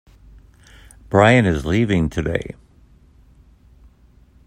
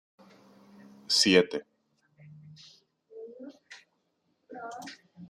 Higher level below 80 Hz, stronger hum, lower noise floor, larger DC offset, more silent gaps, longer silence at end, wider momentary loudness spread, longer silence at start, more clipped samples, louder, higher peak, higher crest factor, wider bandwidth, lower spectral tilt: first, -40 dBFS vs -76 dBFS; neither; second, -51 dBFS vs -76 dBFS; neither; neither; first, 1.95 s vs 0.05 s; second, 16 LU vs 29 LU; about the same, 1.1 s vs 1.1 s; neither; first, -17 LUFS vs -25 LUFS; first, 0 dBFS vs -6 dBFS; second, 20 dB vs 26 dB; second, 11 kHz vs 14.5 kHz; first, -7 dB/octave vs -3 dB/octave